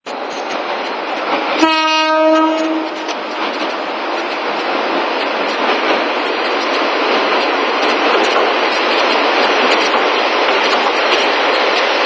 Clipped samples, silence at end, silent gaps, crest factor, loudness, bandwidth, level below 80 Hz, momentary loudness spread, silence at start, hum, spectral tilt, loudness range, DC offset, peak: under 0.1%; 0 s; none; 14 dB; -14 LUFS; 8 kHz; -60 dBFS; 8 LU; 0.05 s; none; -2 dB/octave; 4 LU; under 0.1%; 0 dBFS